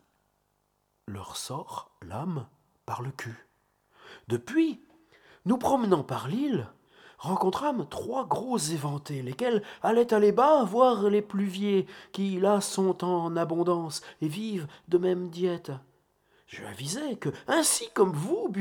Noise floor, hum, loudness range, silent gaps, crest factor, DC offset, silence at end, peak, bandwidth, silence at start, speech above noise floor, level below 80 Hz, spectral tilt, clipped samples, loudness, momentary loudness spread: -74 dBFS; 50 Hz at -55 dBFS; 12 LU; none; 20 dB; under 0.1%; 0 s; -8 dBFS; 19 kHz; 1.05 s; 46 dB; -68 dBFS; -5 dB/octave; under 0.1%; -28 LUFS; 16 LU